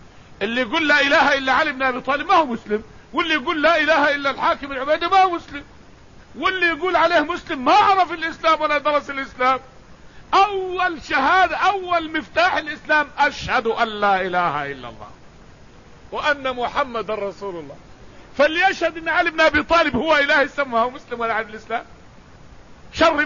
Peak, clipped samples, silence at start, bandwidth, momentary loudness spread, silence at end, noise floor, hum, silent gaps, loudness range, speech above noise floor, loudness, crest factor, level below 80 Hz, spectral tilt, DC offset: -4 dBFS; under 0.1%; 0.4 s; 7.4 kHz; 12 LU; 0 s; -46 dBFS; none; none; 5 LU; 27 dB; -19 LUFS; 16 dB; -48 dBFS; -4 dB/octave; 0.3%